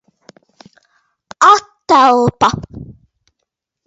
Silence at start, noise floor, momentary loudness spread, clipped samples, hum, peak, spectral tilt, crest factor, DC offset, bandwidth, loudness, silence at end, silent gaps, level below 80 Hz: 1.4 s; -75 dBFS; 20 LU; under 0.1%; none; 0 dBFS; -4.5 dB/octave; 16 dB; under 0.1%; 8 kHz; -11 LUFS; 0.95 s; none; -46 dBFS